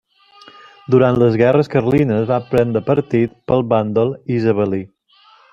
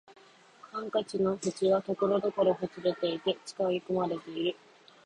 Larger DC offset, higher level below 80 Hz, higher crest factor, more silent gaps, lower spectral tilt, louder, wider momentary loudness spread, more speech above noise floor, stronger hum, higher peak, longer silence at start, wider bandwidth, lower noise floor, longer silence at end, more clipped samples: neither; first, -50 dBFS vs -70 dBFS; about the same, 16 dB vs 18 dB; neither; first, -9 dB/octave vs -5.5 dB/octave; first, -16 LUFS vs -31 LUFS; about the same, 5 LU vs 6 LU; first, 36 dB vs 26 dB; neither; first, -2 dBFS vs -14 dBFS; first, 0.9 s vs 0.1 s; second, 7.4 kHz vs 10.5 kHz; second, -51 dBFS vs -56 dBFS; first, 0.65 s vs 0.5 s; neither